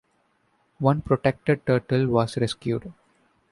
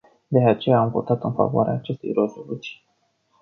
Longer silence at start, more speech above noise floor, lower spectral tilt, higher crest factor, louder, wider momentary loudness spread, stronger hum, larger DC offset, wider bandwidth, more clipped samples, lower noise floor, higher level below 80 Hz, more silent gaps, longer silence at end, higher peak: first, 0.8 s vs 0.3 s; about the same, 45 dB vs 45 dB; second, -7.5 dB/octave vs -9 dB/octave; about the same, 20 dB vs 18 dB; second, -24 LUFS vs -21 LUFS; second, 7 LU vs 14 LU; neither; neither; first, 11.5 kHz vs 6.6 kHz; neither; about the same, -68 dBFS vs -66 dBFS; first, -52 dBFS vs -60 dBFS; neither; about the same, 0.6 s vs 0.7 s; about the same, -6 dBFS vs -4 dBFS